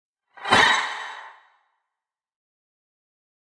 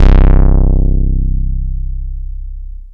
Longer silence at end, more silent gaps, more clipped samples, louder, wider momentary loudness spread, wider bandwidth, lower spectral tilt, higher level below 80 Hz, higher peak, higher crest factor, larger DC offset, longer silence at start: first, 2.2 s vs 0 s; neither; second, under 0.1% vs 2%; second, -19 LUFS vs -15 LUFS; about the same, 20 LU vs 18 LU; first, 11 kHz vs 3.6 kHz; second, -1.5 dB/octave vs -9.5 dB/octave; second, -58 dBFS vs -10 dBFS; about the same, -2 dBFS vs 0 dBFS; first, 26 dB vs 10 dB; neither; first, 0.35 s vs 0 s